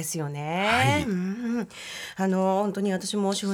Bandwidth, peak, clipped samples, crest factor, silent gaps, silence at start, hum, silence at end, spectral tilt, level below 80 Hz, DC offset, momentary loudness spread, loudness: 18 kHz; -10 dBFS; under 0.1%; 16 dB; none; 0 s; none; 0 s; -5 dB/octave; -60 dBFS; under 0.1%; 10 LU; -26 LUFS